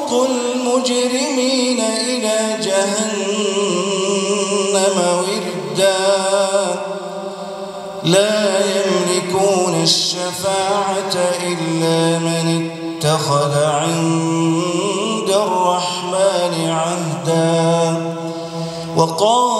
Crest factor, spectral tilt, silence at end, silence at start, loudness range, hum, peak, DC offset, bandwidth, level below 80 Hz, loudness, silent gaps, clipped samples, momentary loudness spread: 16 dB; -4 dB/octave; 0 s; 0 s; 2 LU; none; 0 dBFS; under 0.1%; 13.5 kHz; -64 dBFS; -17 LUFS; none; under 0.1%; 7 LU